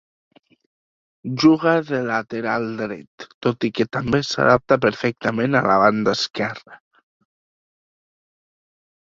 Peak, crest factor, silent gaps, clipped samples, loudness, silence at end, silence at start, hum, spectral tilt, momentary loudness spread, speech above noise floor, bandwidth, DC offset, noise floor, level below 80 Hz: -2 dBFS; 20 dB; 3.07-3.18 s, 3.34-3.41 s; under 0.1%; -20 LUFS; 2.35 s; 1.25 s; none; -5.5 dB/octave; 13 LU; over 71 dB; 7.6 kHz; under 0.1%; under -90 dBFS; -54 dBFS